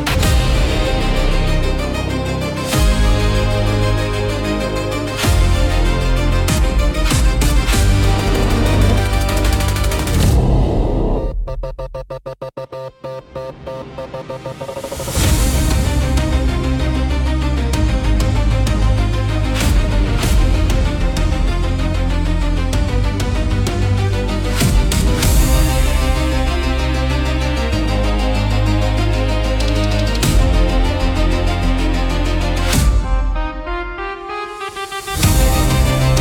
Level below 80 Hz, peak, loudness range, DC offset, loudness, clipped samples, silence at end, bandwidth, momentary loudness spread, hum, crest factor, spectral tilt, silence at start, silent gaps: -18 dBFS; 0 dBFS; 4 LU; under 0.1%; -17 LUFS; under 0.1%; 0 s; 17.5 kHz; 11 LU; none; 14 dB; -5 dB/octave; 0 s; none